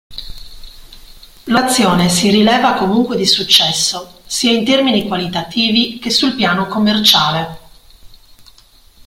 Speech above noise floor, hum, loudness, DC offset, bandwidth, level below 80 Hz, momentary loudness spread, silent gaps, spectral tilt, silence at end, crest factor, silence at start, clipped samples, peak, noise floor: 32 dB; none; -12 LUFS; under 0.1%; 16.5 kHz; -42 dBFS; 12 LU; none; -3.5 dB/octave; 0.9 s; 16 dB; 0.1 s; under 0.1%; 0 dBFS; -46 dBFS